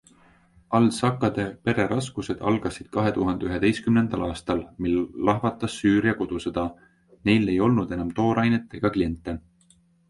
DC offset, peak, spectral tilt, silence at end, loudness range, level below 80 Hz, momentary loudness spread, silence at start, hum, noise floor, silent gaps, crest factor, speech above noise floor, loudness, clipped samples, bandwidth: under 0.1%; -6 dBFS; -6.5 dB/octave; 0.7 s; 1 LU; -48 dBFS; 8 LU; 0.7 s; none; -60 dBFS; none; 20 dB; 36 dB; -24 LUFS; under 0.1%; 11.5 kHz